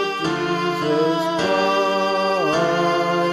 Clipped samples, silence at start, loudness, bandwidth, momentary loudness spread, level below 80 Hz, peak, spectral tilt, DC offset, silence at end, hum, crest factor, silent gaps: under 0.1%; 0 s; -19 LUFS; 15 kHz; 3 LU; -58 dBFS; -6 dBFS; -5 dB/octave; under 0.1%; 0 s; none; 12 dB; none